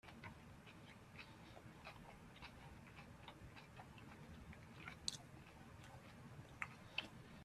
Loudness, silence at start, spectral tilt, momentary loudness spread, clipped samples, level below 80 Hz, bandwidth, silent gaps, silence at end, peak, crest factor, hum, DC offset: -56 LUFS; 0.05 s; -3 dB/octave; 12 LU; under 0.1%; -70 dBFS; 14 kHz; none; 0 s; -22 dBFS; 34 dB; none; under 0.1%